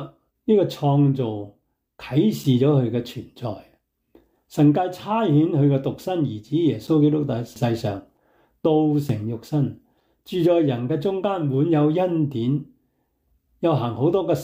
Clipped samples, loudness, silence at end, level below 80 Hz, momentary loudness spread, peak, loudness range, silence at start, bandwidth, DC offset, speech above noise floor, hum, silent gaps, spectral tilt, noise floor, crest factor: under 0.1%; -22 LUFS; 0 s; -60 dBFS; 13 LU; -8 dBFS; 2 LU; 0 s; 16 kHz; under 0.1%; 49 dB; none; none; -8.5 dB/octave; -69 dBFS; 14 dB